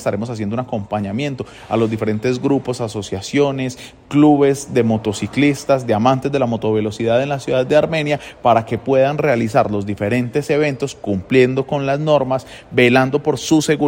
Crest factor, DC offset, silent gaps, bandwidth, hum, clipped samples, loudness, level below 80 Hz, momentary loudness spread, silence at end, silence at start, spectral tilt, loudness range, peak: 16 dB; under 0.1%; none; 16.5 kHz; none; under 0.1%; -17 LUFS; -50 dBFS; 9 LU; 0 s; 0 s; -6 dB/octave; 4 LU; -2 dBFS